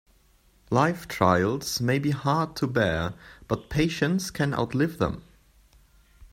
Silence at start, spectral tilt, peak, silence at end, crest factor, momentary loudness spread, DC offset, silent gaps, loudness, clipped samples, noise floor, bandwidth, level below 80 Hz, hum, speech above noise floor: 0.7 s; -5.5 dB/octave; -6 dBFS; 0.05 s; 22 dB; 8 LU; under 0.1%; none; -26 LUFS; under 0.1%; -61 dBFS; 16 kHz; -50 dBFS; none; 35 dB